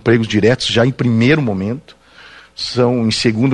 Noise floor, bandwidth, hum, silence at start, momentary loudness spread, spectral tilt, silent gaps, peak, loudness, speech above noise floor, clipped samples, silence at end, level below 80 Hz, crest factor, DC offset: -41 dBFS; 10.5 kHz; none; 0.05 s; 11 LU; -6 dB/octave; none; 0 dBFS; -15 LUFS; 27 dB; under 0.1%; 0 s; -46 dBFS; 14 dB; under 0.1%